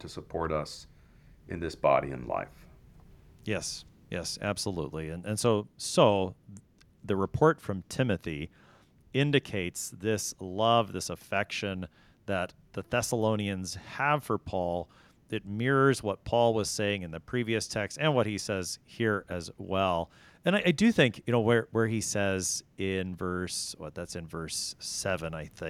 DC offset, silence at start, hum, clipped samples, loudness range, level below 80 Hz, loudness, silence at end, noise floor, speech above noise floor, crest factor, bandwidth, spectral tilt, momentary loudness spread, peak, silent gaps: under 0.1%; 0 s; none; under 0.1%; 6 LU; -56 dBFS; -30 LUFS; 0 s; -60 dBFS; 30 dB; 24 dB; 16 kHz; -4.5 dB/octave; 13 LU; -8 dBFS; none